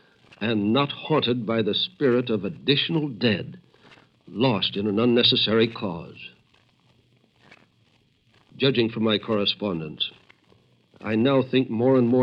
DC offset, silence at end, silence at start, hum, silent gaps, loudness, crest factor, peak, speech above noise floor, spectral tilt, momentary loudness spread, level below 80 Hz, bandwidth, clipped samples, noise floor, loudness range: under 0.1%; 0 s; 0.4 s; none; none; -23 LUFS; 18 dB; -6 dBFS; 40 dB; -8 dB/octave; 12 LU; -66 dBFS; 5.8 kHz; under 0.1%; -63 dBFS; 5 LU